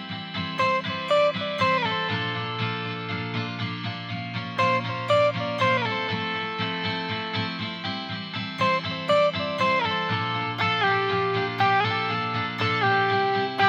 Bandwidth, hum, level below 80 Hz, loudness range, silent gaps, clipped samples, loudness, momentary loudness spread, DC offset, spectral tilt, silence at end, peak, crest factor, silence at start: 8.8 kHz; none; -72 dBFS; 4 LU; none; under 0.1%; -25 LUFS; 8 LU; under 0.1%; -5.5 dB/octave; 0 s; -8 dBFS; 16 dB; 0 s